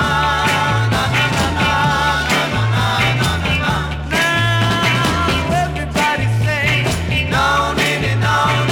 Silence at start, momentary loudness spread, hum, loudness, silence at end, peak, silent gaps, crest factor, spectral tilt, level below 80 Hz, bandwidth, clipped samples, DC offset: 0 s; 3 LU; none; -15 LUFS; 0 s; -4 dBFS; none; 12 dB; -4.5 dB/octave; -30 dBFS; 18 kHz; under 0.1%; under 0.1%